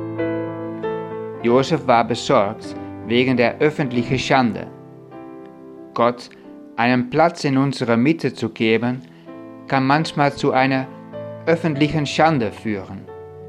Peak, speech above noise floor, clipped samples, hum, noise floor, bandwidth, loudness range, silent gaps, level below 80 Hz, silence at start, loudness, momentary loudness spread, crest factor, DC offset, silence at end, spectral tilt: -2 dBFS; 21 dB; under 0.1%; none; -39 dBFS; 11 kHz; 3 LU; none; -54 dBFS; 0 s; -19 LUFS; 20 LU; 18 dB; under 0.1%; 0 s; -6 dB/octave